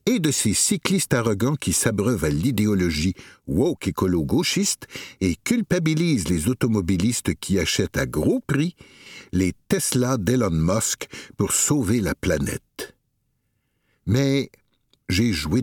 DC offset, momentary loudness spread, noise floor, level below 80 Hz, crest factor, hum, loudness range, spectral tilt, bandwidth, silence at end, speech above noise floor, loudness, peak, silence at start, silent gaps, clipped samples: under 0.1%; 9 LU; -71 dBFS; -42 dBFS; 20 dB; none; 3 LU; -4.5 dB/octave; 19 kHz; 0 s; 49 dB; -22 LUFS; -2 dBFS; 0.05 s; none; under 0.1%